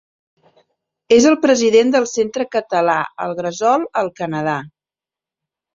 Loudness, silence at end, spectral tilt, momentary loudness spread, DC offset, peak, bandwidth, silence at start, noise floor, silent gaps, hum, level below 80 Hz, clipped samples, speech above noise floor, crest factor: -16 LUFS; 1.05 s; -4 dB/octave; 10 LU; under 0.1%; -2 dBFS; 7.8 kHz; 1.1 s; -89 dBFS; none; none; -60 dBFS; under 0.1%; 74 dB; 16 dB